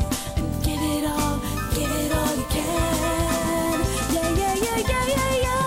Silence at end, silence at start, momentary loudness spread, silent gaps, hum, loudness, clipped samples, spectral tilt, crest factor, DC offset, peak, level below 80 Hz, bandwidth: 0 s; 0 s; 4 LU; none; none; -23 LUFS; under 0.1%; -4.5 dB/octave; 10 dB; under 0.1%; -12 dBFS; -32 dBFS; 16 kHz